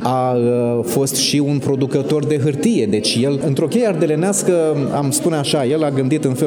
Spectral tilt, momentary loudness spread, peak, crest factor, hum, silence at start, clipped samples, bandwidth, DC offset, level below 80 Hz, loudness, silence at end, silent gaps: -5 dB/octave; 2 LU; -2 dBFS; 14 dB; none; 0 s; under 0.1%; over 20 kHz; under 0.1%; -58 dBFS; -17 LUFS; 0 s; none